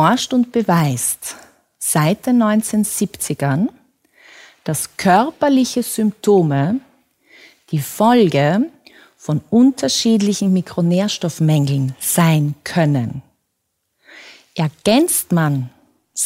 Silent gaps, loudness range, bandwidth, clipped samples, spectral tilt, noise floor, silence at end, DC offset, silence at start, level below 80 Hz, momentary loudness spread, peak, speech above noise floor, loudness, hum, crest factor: none; 3 LU; 16.5 kHz; under 0.1%; -5 dB/octave; -72 dBFS; 0 s; under 0.1%; 0 s; -58 dBFS; 10 LU; -2 dBFS; 56 dB; -17 LUFS; none; 16 dB